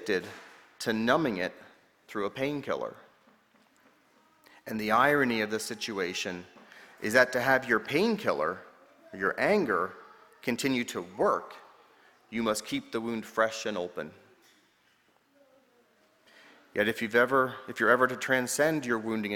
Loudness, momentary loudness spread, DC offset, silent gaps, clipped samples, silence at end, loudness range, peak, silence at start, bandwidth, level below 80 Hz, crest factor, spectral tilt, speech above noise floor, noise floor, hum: -29 LUFS; 14 LU; under 0.1%; none; under 0.1%; 0 s; 9 LU; -8 dBFS; 0 s; 19 kHz; -68 dBFS; 24 dB; -4 dB/octave; 39 dB; -67 dBFS; none